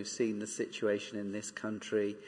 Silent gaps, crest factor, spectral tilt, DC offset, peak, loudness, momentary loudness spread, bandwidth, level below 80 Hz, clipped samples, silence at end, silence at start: none; 16 dB; -4 dB/octave; under 0.1%; -20 dBFS; -36 LUFS; 6 LU; 10.5 kHz; -82 dBFS; under 0.1%; 0 s; 0 s